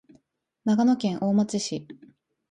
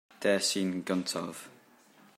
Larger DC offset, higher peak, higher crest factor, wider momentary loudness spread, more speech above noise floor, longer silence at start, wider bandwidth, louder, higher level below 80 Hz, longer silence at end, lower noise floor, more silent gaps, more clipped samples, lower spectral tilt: neither; about the same, -12 dBFS vs -14 dBFS; second, 14 dB vs 20 dB; second, 10 LU vs 17 LU; first, 45 dB vs 29 dB; first, 0.65 s vs 0.2 s; second, 10 kHz vs 16 kHz; first, -25 LUFS vs -31 LUFS; first, -68 dBFS vs -80 dBFS; about the same, 0.6 s vs 0.65 s; first, -69 dBFS vs -60 dBFS; neither; neither; first, -6 dB/octave vs -3.5 dB/octave